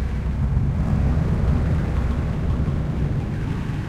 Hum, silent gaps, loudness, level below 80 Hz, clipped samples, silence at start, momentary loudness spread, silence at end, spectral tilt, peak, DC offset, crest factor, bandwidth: none; none; -23 LUFS; -26 dBFS; under 0.1%; 0 s; 4 LU; 0 s; -9 dB/octave; -8 dBFS; under 0.1%; 12 dB; 8.8 kHz